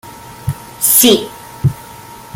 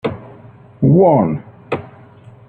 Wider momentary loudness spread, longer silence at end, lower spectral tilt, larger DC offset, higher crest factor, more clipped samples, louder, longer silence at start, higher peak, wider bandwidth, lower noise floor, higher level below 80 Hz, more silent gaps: first, 26 LU vs 16 LU; second, 0 s vs 0.6 s; second, -3.5 dB/octave vs -11 dB/octave; neither; about the same, 16 dB vs 14 dB; neither; first, -11 LUFS vs -15 LUFS; about the same, 0.05 s vs 0.05 s; about the same, 0 dBFS vs -2 dBFS; first, 19.5 kHz vs 4.5 kHz; second, -34 dBFS vs -41 dBFS; about the same, -44 dBFS vs -48 dBFS; neither